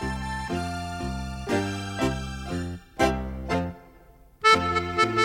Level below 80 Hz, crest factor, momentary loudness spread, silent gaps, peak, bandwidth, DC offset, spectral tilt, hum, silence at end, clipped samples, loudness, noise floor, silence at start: -40 dBFS; 22 dB; 13 LU; none; -6 dBFS; 16.5 kHz; under 0.1%; -5 dB/octave; none; 0 s; under 0.1%; -27 LUFS; -53 dBFS; 0 s